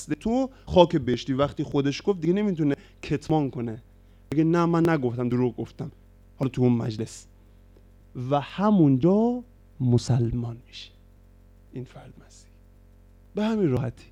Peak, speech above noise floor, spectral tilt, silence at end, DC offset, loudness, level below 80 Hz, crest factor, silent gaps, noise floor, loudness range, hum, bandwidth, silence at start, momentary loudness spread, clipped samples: -2 dBFS; 29 dB; -7.5 dB/octave; 0.2 s; under 0.1%; -25 LUFS; -50 dBFS; 24 dB; none; -53 dBFS; 7 LU; none; 11 kHz; 0 s; 20 LU; under 0.1%